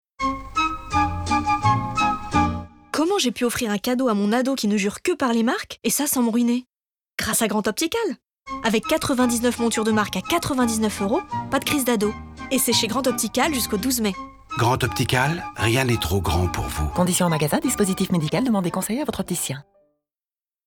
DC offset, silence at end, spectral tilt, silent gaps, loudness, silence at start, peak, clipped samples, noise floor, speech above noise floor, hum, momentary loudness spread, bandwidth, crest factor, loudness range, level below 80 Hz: under 0.1%; 1.05 s; -4 dB/octave; none; -22 LUFS; 0.2 s; -4 dBFS; under 0.1%; under -90 dBFS; over 68 dB; none; 6 LU; 20 kHz; 20 dB; 1 LU; -42 dBFS